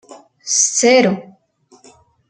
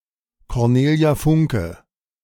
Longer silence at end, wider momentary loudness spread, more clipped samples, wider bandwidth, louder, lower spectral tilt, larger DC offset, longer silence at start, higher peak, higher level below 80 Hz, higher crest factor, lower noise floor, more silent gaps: first, 1.1 s vs 0.5 s; first, 16 LU vs 11 LU; neither; second, 10 kHz vs 17.5 kHz; first, -13 LUFS vs -18 LUFS; second, -2.5 dB/octave vs -7.5 dB/octave; neither; second, 0.1 s vs 0.5 s; first, -2 dBFS vs -6 dBFS; second, -64 dBFS vs -38 dBFS; about the same, 16 dB vs 14 dB; about the same, -53 dBFS vs -56 dBFS; neither